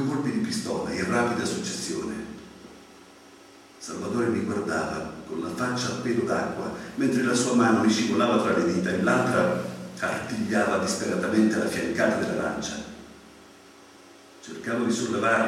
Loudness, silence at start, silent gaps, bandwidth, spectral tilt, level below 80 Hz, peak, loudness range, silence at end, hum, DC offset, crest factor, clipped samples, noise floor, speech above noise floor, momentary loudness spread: -26 LUFS; 0 s; none; 14.5 kHz; -4.5 dB/octave; -62 dBFS; -8 dBFS; 8 LU; 0 s; none; under 0.1%; 18 dB; under 0.1%; -50 dBFS; 26 dB; 13 LU